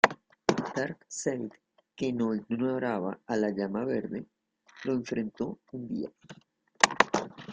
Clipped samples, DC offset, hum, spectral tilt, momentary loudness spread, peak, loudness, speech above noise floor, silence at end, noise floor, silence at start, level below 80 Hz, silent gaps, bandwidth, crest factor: under 0.1%; under 0.1%; none; -4 dB/octave; 12 LU; -2 dBFS; -31 LUFS; 25 dB; 0 s; -57 dBFS; 0.05 s; -68 dBFS; none; 9.6 kHz; 30 dB